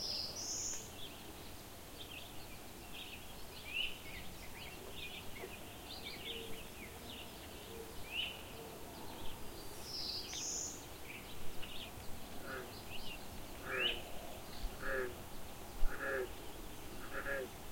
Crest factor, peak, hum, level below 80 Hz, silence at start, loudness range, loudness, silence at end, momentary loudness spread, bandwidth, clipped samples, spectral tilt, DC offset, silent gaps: 24 dB; -20 dBFS; none; -52 dBFS; 0 s; 5 LU; -45 LUFS; 0 s; 11 LU; 16.5 kHz; under 0.1%; -2 dB/octave; under 0.1%; none